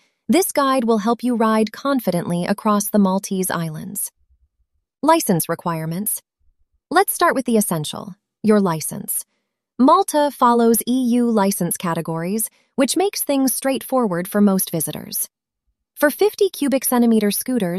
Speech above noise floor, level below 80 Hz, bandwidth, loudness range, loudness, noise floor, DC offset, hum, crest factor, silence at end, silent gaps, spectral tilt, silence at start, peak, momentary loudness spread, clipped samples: 56 dB; -62 dBFS; 15.5 kHz; 4 LU; -19 LUFS; -74 dBFS; under 0.1%; none; 18 dB; 0 s; none; -4.5 dB/octave; 0.3 s; -2 dBFS; 9 LU; under 0.1%